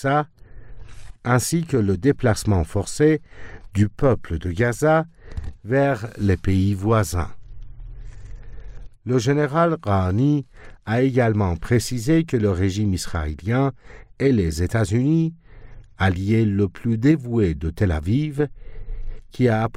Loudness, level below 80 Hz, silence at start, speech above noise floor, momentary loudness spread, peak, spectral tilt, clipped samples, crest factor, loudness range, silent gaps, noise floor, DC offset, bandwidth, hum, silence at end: -21 LUFS; -38 dBFS; 0 s; 21 dB; 14 LU; -6 dBFS; -7 dB/octave; under 0.1%; 14 dB; 3 LU; none; -41 dBFS; under 0.1%; 15.5 kHz; none; 0 s